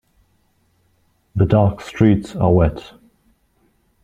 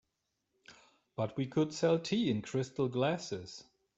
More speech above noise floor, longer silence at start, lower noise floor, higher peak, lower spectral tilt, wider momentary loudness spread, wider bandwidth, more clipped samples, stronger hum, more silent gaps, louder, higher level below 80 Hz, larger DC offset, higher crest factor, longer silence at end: second, 46 dB vs 50 dB; first, 1.35 s vs 0.7 s; second, -62 dBFS vs -84 dBFS; first, -2 dBFS vs -18 dBFS; first, -9 dB/octave vs -6 dB/octave; second, 8 LU vs 14 LU; about the same, 8.8 kHz vs 8.2 kHz; neither; neither; neither; first, -17 LUFS vs -34 LUFS; first, -38 dBFS vs -72 dBFS; neither; about the same, 18 dB vs 18 dB; first, 1.25 s vs 0.35 s